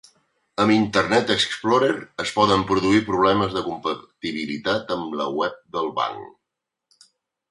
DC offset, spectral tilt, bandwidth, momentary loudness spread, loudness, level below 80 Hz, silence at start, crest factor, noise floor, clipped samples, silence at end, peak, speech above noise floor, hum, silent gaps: under 0.1%; -5 dB/octave; 11.5 kHz; 9 LU; -22 LUFS; -54 dBFS; 0.6 s; 20 dB; -83 dBFS; under 0.1%; 1.2 s; -4 dBFS; 62 dB; none; none